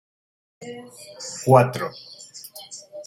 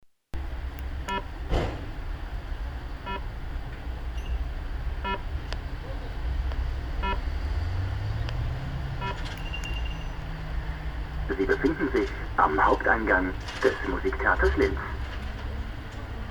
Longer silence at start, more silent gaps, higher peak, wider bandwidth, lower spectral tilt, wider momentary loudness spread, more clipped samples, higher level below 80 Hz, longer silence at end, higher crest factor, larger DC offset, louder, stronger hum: first, 0.6 s vs 0.05 s; neither; first, -2 dBFS vs -8 dBFS; second, 16.5 kHz vs 19.5 kHz; about the same, -5.5 dB/octave vs -6.5 dB/octave; first, 23 LU vs 14 LU; neither; second, -66 dBFS vs -32 dBFS; about the same, 0.05 s vs 0 s; about the same, 22 dB vs 22 dB; neither; first, -20 LUFS vs -30 LUFS; neither